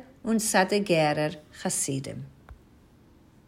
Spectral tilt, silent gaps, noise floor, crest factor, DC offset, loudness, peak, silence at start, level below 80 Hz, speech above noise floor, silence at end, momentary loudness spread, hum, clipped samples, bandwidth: -4 dB/octave; none; -56 dBFS; 20 dB; under 0.1%; -26 LUFS; -8 dBFS; 0 s; -58 dBFS; 30 dB; 0.95 s; 16 LU; none; under 0.1%; 16 kHz